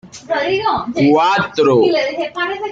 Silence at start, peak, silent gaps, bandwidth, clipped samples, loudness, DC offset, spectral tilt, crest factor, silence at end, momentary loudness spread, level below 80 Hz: 0.05 s; -2 dBFS; none; 7.8 kHz; under 0.1%; -15 LUFS; under 0.1%; -5.5 dB/octave; 12 dB; 0 s; 8 LU; -54 dBFS